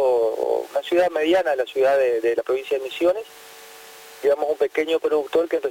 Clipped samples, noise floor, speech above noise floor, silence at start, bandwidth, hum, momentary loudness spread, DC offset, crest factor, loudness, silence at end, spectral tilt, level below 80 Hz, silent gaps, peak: under 0.1%; -43 dBFS; 22 dB; 0 s; 17 kHz; none; 21 LU; under 0.1%; 14 dB; -21 LUFS; 0 s; -3.5 dB/octave; -64 dBFS; none; -8 dBFS